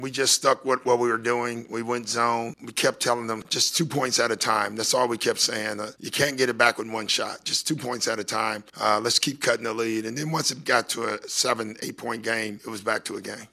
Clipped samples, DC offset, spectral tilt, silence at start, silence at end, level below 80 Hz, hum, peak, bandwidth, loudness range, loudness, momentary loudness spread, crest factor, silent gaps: under 0.1%; under 0.1%; -2.5 dB/octave; 0 s; 0.05 s; -70 dBFS; none; -2 dBFS; 13.5 kHz; 3 LU; -24 LUFS; 9 LU; 22 dB; none